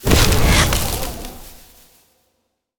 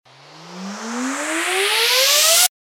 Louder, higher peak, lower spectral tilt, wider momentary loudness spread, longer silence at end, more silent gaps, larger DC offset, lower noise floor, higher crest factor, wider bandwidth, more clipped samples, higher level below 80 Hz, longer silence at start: about the same, -16 LUFS vs -15 LUFS; about the same, 0 dBFS vs -2 dBFS; first, -3.5 dB/octave vs 0.5 dB/octave; about the same, 20 LU vs 19 LU; first, 1.25 s vs 0.25 s; neither; neither; first, -70 dBFS vs -42 dBFS; about the same, 18 dB vs 18 dB; first, over 20 kHz vs 17 kHz; neither; first, -24 dBFS vs -88 dBFS; second, 0 s vs 0.35 s